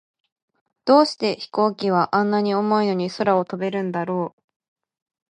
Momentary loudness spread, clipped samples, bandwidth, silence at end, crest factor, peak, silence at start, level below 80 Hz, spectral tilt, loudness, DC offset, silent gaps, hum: 9 LU; under 0.1%; 10 kHz; 1 s; 18 dB; -4 dBFS; 0.85 s; -72 dBFS; -6.5 dB/octave; -21 LUFS; under 0.1%; none; none